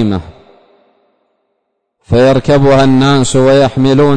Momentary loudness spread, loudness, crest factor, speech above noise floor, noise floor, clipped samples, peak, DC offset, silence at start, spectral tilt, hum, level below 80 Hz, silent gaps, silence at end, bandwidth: 7 LU; -9 LUFS; 8 dB; 59 dB; -67 dBFS; under 0.1%; -2 dBFS; under 0.1%; 0 s; -6.5 dB/octave; none; -32 dBFS; none; 0 s; 9.6 kHz